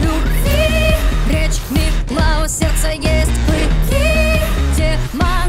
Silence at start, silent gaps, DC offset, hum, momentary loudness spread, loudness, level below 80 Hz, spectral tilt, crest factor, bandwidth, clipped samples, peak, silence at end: 0 s; none; under 0.1%; none; 4 LU; -16 LUFS; -16 dBFS; -5 dB/octave; 10 dB; 16.5 kHz; under 0.1%; -4 dBFS; 0 s